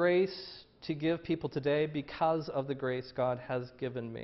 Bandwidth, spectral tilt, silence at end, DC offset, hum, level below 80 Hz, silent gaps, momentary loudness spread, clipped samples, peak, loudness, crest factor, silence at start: 6 kHz; -8.5 dB/octave; 0 s; under 0.1%; none; -66 dBFS; none; 8 LU; under 0.1%; -16 dBFS; -34 LUFS; 16 dB; 0 s